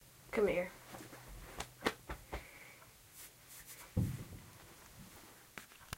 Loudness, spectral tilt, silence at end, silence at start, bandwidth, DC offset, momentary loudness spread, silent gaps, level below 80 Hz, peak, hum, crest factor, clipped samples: -42 LUFS; -5 dB/octave; 0 s; 0 s; 16 kHz; under 0.1%; 20 LU; none; -58 dBFS; -18 dBFS; none; 26 dB; under 0.1%